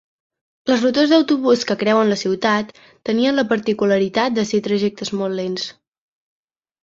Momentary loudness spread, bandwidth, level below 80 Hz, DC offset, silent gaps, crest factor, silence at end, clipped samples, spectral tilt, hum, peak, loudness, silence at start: 10 LU; 8 kHz; -60 dBFS; under 0.1%; none; 16 dB; 1.1 s; under 0.1%; -5 dB/octave; none; -4 dBFS; -18 LUFS; 0.65 s